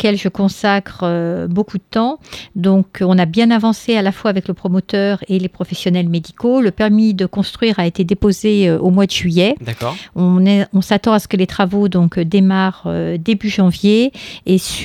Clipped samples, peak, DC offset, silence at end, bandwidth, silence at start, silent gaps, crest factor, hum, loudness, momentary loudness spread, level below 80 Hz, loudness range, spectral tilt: under 0.1%; 0 dBFS; under 0.1%; 0 s; 14 kHz; 0 s; none; 14 dB; none; -15 LUFS; 7 LU; -44 dBFS; 2 LU; -6.5 dB/octave